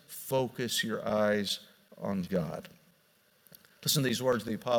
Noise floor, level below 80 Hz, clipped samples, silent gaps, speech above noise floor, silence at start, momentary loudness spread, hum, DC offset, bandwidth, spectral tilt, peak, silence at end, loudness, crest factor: -67 dBFS; -68 dBFS; under 0.1%; none; 36 dB; 0.1 s; 8 LU; none; under 0.1%; 18 kHz; -4 dB/octave; -14 dBFS; 0 s; -31 LUFS; 18 dB